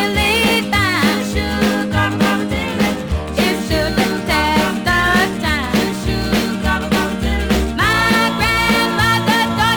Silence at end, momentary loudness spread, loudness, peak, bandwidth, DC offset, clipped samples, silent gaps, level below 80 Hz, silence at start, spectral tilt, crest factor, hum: 0 s; 5 LU; -16 LUFS; -2 dBFS; over 20 kHz; under 0.1%; under 0.1%; none; -28 dBFS; 0 s; -4.5 dB/octave; 14 dB; none